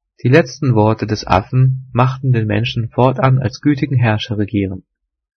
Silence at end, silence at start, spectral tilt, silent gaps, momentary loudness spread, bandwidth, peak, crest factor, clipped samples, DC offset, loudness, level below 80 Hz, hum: 0.55 s; 0.25 s; -7.5 dB/octave; none; 6 LU; 6.4 kHz; 0 dBFS; 16 dB; under 0.1%; under 0.1%; -15 LUFS; -44 dBFS; none